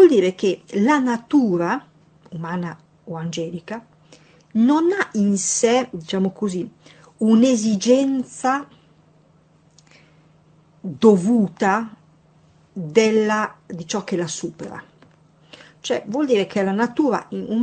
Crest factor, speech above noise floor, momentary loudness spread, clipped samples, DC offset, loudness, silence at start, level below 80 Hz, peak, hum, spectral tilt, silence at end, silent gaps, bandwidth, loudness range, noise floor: 20 dB; 36 dB; 18 LU; under 0.1%; under 0.1%; -20 LUFS; 0 s; -66 dBFS; -2 dBFS; none; -5 dB/octave; 0 s; none; 9 kHz; 6 LU; -55 dBFS